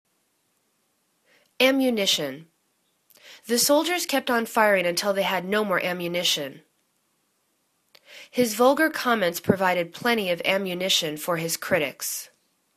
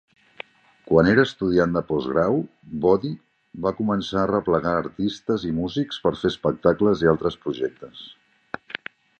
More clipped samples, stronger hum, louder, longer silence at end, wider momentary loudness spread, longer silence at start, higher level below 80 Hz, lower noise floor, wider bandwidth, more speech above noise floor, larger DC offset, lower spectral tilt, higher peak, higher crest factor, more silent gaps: neither; neither; about the same, -23 LUFS vs -22 LUFS; second, 0.5 s vs 1.05 s; second, 8 LU vs 19 LU; first, 1.6 s vs 0.9 s; second, -68 dBFS vs -48 dBFS; first, -71 dBFS vs -44 dBFS; first, 14 kHz vs 8.4 kHz; first, 47 dB vs 22 dB; neither; second, -3 dB/octave vs -7 dB/octave; about the same, -4 dBFS vs -4 dBFS; about the same, 22 dB vs 20 dB; neither